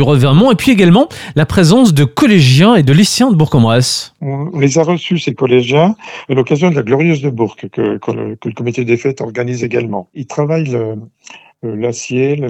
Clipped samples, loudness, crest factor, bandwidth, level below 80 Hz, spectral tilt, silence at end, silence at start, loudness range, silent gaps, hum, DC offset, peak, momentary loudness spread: under 0.1%; -12 LUFS; 12 dB; 16 kHz; -44 dBFS; -6 dB/octave; 0 s; 0 s; 9 LU; none; none; under 0.1%; 0 dBFS; 12 LU